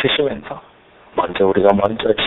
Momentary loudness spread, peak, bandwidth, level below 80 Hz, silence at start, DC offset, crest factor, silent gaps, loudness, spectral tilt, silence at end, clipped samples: 17 LU; 0 dBFS; 4.1 kHz; -48 dBFS; 0 s; under 0.1%; 18 dB; none; -17 LUFS; -3 dB/octave; 0 s; under 0.1%